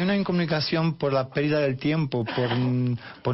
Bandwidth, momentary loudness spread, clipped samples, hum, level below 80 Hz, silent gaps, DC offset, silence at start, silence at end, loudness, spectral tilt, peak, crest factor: 5.8 kHz; 3 LU; under 0.1%; none; -58 dBFS; none; under 0.1%; 0 s; 0 s; -25 LUFS; -5.5 dB/octave; -14 dBFS; 12 dB